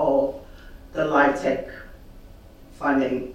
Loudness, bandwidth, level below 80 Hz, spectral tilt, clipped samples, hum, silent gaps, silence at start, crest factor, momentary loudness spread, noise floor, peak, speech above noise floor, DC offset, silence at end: -23 LUFS; 14.5 kHz; -46 dBFS; -6 dB/octave; under 0.1%; none; none; 0 s; 20 dB; 20 LU; -45 dBFS; -6 dBFS; 23 dB; under 0.1%; 0 s